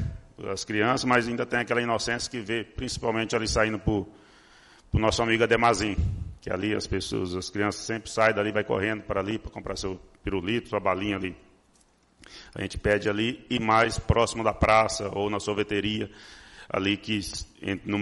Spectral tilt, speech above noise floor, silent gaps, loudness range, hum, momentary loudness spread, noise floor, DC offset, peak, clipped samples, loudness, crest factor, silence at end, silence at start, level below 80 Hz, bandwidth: -4.5 dB/octave; 36 dB; none; 5 LU; none; 13 LU; -63 dBFS; under 0.1%; -8 dBFS; under 0.1%; -27 LUFS; 20 dB; 0 s; 0 s; -44 dBFS; 11.5 kHz